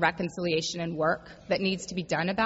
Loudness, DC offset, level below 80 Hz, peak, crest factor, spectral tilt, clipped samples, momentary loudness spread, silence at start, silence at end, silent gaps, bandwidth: -29 LUFS; under 0.1%; -58 dBFS; -10 dBFS; 20 dB; -4.5 dB/octave; under 0.1%; 4 LU; 0 s; 0 s; none; 8 kHz